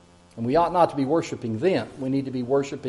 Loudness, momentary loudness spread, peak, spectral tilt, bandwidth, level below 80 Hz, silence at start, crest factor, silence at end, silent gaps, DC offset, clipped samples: -24 LUFS; 6 LU; -6 dBFS; -7 dB/octave; 11.5 kHz; -56 dBFS; 0.35 s; 18 dB; 0 s; none; under 0.1%; under 0.1%